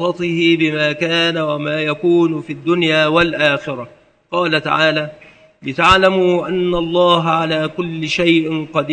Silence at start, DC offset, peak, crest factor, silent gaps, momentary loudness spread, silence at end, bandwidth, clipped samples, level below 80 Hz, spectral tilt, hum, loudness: 0 s; under 0.1%; 0 dBFS; 16 dB; none; 9 LU; 0 s; 9 kHz; under 0.1%; -44 dBFS; -5.5 dB/octave; none; -15 LUFS